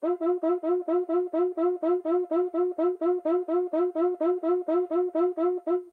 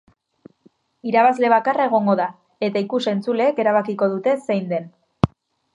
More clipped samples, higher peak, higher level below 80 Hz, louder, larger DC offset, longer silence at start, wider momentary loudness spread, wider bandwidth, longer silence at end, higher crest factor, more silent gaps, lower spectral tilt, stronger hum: neither; second, -16 dBFS vs 0 dBFS; second, under -90 dBFS vs -50 dBFS; second, -27 LUFS vs -20 LUFS; neither; second, 0 s vs 1.05 s; second, 2 LU vs 9 LU; second, 3.8 kHz vs 10.5 kHz; second, 0.05 s vs 0.45 s; second, 10 dB vs 20 dB; neither; about the same, -7 dB/octave vs -7 dB/octave; neither